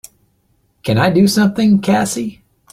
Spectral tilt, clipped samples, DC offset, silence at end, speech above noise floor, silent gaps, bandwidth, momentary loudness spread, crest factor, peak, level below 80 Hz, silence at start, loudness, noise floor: -5.5 dB/octave; under 0.1%; under 0.1%; 0.4 s; 47 dB; none; 15.5 kHz; 12 LU; 14 dB; -2 dBFS; -48 dBFS; 0.85 s; -14 LUFS; -60 dBFS